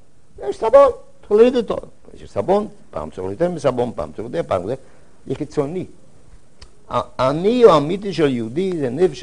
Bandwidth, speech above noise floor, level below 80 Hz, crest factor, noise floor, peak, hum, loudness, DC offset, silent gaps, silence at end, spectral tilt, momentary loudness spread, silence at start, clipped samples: 10.5 kHz; 31 dB; -48 dBFS; 18 dB; -49 dBFS; 0 dBFS; none; -18 LUFS; 1%; none; 0 s; -7 dB/octave; 18 LU; 0.35 s; under 0.1%